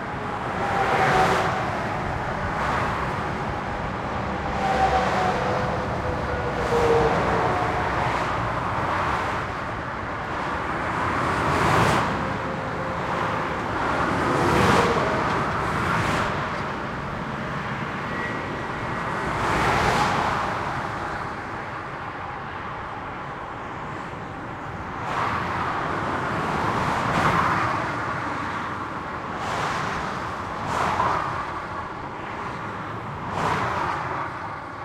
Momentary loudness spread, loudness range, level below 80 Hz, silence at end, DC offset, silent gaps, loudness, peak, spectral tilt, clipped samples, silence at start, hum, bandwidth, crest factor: 11 LU; 6 LU; -42 dBFS; 0 s; under 0.1%; none; -25 LUFS; -6 dBFS; -5.5 dB/octave; under 0.1%; 0 s; none; 16.5 kHz; 20 dB